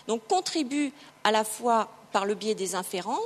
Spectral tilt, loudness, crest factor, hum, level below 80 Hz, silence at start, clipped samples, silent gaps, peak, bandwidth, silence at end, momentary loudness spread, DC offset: -3 dB/octave; -28 LUFS; 22 dB; none; -80 dBFS; 0.05 s; under 0.1%; none; -6 dBFS; 13.5 kHz; 0 s; 5 LU; under 0.1%